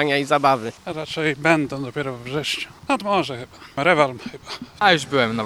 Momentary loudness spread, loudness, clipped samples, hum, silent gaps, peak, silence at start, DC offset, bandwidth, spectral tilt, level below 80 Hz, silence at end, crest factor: 15 LU; -21 LUFS; under 0.1%; none; none; 0 dBFS; 0 s; under 0.1%; 16 kHz; -4.5 dB/octave; -58 dBFS; 0 s; 22 dB